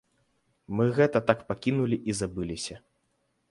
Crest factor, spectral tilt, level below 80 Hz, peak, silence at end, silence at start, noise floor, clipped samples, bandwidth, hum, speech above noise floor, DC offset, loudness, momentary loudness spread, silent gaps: 22 dB; -6 dB/octave; -56 dBFS; -6 dBFS; 0.75 s; 0.7 s; -74 dBFS; under 0.1%; 11.5 kHz; none; 47 dB; under 0.1%; -28 LUFS; 11 LU; none